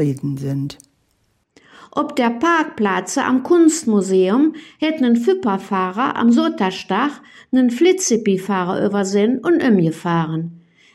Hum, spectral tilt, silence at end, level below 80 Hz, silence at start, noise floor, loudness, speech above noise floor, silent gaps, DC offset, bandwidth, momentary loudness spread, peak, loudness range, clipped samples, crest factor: none; -5.5 dB/octave; 0.35 s; -62 dBFS; 0 s; -64 dBFS; -17 LUFS; 47 dB; none; under 0.1%; 13.5 kHz; 9 LU; -4 dBFS; 2 LU; under 0.1%; 14 dB